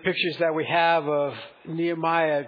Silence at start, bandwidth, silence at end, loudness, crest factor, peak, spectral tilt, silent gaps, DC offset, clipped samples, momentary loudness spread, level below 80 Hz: 0 s; 5.2 kHz; 0 s; -24 LUFS; 16 dB; -8 dBFS; -7.5 dB/octave; none; under 0.1%; under 0.1%; 10 LU; -72 dBFS